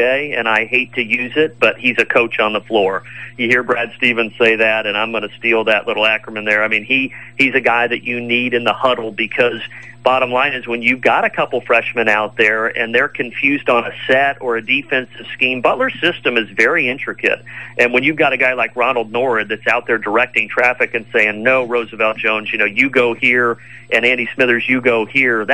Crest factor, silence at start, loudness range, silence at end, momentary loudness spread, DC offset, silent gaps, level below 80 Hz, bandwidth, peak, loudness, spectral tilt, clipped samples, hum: 16 dB; 0 s; 1 LU; 0 s; 5 LU; 0.6%; none; -60 dBFS; 11.5 kHz; 0 dBFS; -15 LUFS; -5 dB/octave; under 0.1%; none